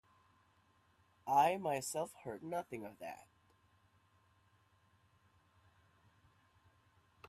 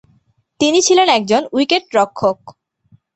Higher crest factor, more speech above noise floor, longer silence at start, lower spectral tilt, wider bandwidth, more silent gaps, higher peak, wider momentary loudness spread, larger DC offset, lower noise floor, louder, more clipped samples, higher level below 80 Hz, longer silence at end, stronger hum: first, 24 dB vs 16 dB; second, 35 dB vs 44 dB; first, 1.25 s vs 0.6 s; first, -4 dB/octave vs -2.5 dB/octave; first, 15 kHz vs 8.4 kHz; neither; second, -20 dBFS vs 0 dBFS; first, 19 LU vs 8 LU; neither; first, -73 dBFS vs -58 dBFS; second, -37 LUFS vs -14 LUFS; neither; second, -82 dBFS vs -58 dBFS; first, 4.05 s vs 0.65 s; neither